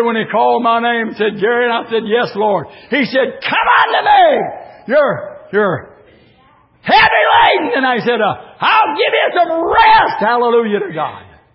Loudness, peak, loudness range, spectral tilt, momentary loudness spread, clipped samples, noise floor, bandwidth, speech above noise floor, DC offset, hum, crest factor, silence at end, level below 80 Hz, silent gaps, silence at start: -13 LUFS; 0 dBFS; 3 LU; -8 dB/octave; 9 LU; under 0.1%; -50 dBFS; 5.8 kHz; 37 dB; under 0.1%; none; 14 dB; 0.3 s; -48 dBFS; none; 0 s